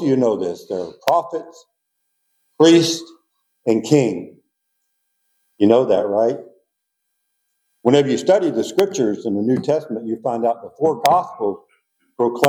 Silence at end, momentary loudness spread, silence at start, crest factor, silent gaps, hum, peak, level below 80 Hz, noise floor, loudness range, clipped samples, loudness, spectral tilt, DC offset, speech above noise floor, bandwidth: 0 s; 12 LU; 0 s; 18 dB; none; none; 0 dBFS; -72 dBFS; -75 dBFS; 2 LU; under 0.1%; -18 LUFS; -5.5 dB/octave; under 0.1%; 58 dB; over 20 kHz